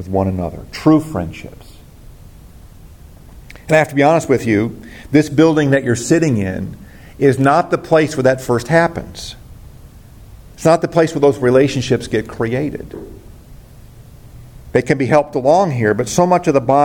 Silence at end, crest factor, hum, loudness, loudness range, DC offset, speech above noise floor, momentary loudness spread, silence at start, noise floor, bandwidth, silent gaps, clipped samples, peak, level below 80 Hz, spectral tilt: 0 s; 16 dB; none; -15 LUFS; 6 LU; under 0.1%; 25 dB; 15 LU; 0 s; -39 dBFS; 17 kHz; none; under 0.1%; 0 dBFS; -42 dBFS; -6 dB/octave